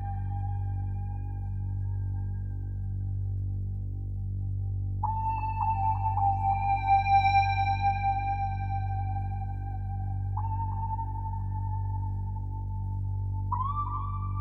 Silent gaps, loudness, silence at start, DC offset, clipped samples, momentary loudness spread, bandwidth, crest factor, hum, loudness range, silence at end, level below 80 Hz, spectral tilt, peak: none; -31 LUFS; 0 s; under 0.1%; under 0.1%; 10 LU; 5.8 kHz; 16 dB; 50 Hz at -85 dBFS; 8 LU; 0 s; -38 dBFS; -8 dB/octave; -12 dBFS